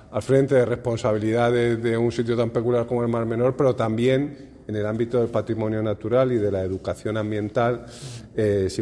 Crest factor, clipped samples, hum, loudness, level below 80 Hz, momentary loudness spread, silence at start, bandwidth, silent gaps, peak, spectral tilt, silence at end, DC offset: 16 dB; under 0.1%; none; -23 LUFS; -52 dBFS; 8 LU; 0.1 s; 12 kHz; none; -6 dBFS; -7.5 dB/octave; 0 s; under 0.1%